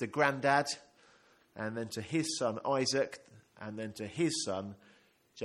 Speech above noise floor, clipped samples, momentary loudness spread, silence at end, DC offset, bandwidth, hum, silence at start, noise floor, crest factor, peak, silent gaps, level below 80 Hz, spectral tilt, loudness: 32 dB; under 0.1%; 16 LU; 0 s; under 0.1%; 14 kHz; none; 0 s; -66 dBFS; 24 dB; -12 dBFS; none; -76 dBFS; -4 dB/octave; -34 LUFS